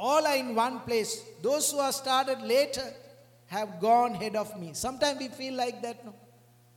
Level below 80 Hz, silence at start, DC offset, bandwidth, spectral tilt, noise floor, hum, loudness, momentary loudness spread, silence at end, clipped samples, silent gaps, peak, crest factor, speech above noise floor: -66 dBFS; 0 s; under 0.1%; 17 kHz; -2.5 dB/octave; -59 dBFS; none; -29 LUFS; 11 LU; 0.6 s; under 0.1%; none; -12 dBFS; 18 dB; 30 dB